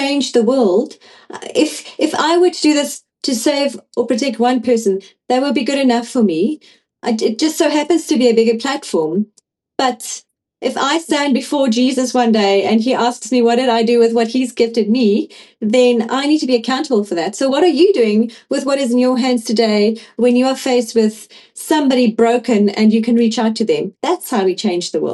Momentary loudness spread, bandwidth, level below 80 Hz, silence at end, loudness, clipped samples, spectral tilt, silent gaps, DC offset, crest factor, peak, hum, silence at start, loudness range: 8 LU; 12.5 kHz; -66 dBFS; 0 s; -15 LUFS; under 0.1%; -4.5 dB/octave; none; under 0.1%; 14 dB; 0 dBFS; none; 0 s; 3 LU